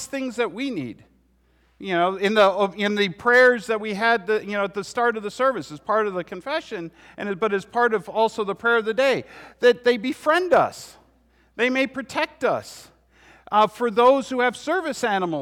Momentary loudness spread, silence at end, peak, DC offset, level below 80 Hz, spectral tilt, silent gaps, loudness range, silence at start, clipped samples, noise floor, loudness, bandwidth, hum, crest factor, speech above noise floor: 12 LU; 0 s; -6 dBFS; under 0.1%; -62 dBFS; -4.5 dB/octave; none; 5 LU; 0 s; under 0.1%; -61 dBFS; -22 LUFS; 14.5 kHz; none; 16 dB; 39 dB